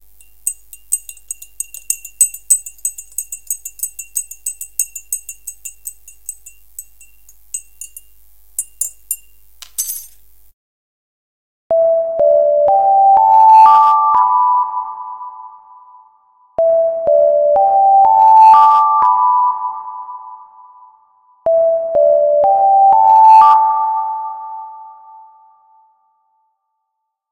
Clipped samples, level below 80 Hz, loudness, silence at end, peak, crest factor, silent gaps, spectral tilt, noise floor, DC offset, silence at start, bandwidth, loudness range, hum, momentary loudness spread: under 0.1%; -56 dBFS; -12 LUFS; 2.4 s; 0 dBFS; 14 dB; 10.53-11.70 s; -0.5 dB/octave; -74 dBFS; under 0.1%; 0.45 s; 17 kHz; 16 LU; none; 23 LU